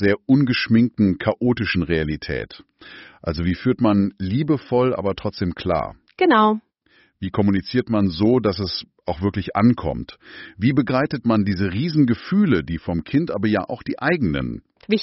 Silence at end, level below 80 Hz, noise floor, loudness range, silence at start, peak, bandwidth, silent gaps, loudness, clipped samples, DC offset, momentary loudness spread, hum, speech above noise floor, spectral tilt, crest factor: 0 s; -44 dBFS; -59 dBFS; 2 LU; 0 s; -4 dBFS; 6 kHz; none; -20 LUFS; under 0.1%; under 0.1%; 11 LU; none; 39 dB; -5.5 dB/octave; 16 dB